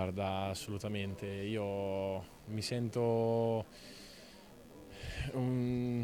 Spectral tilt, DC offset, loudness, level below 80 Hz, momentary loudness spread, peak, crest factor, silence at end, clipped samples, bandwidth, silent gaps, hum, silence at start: -6.5 dB/octave; under 0.1%; -37 LUFS; -56 dBFS; 20 LU; -22 dBFS; 16 dB; 0 s; under 0.1%; 18 kHz; none; none; 0 s